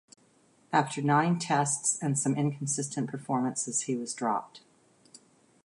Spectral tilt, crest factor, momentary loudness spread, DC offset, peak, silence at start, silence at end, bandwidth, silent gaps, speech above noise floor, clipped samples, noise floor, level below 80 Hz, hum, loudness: -4.5 dB/octave; 20 dB; 6 LU; under 0.1%; -10 dBFS; 0.7 s; 1.05 s; 11.5 kHz; none; 35 dB; under 0.1%; -64 dBFS; -76 dBFS; none; -29 LUFS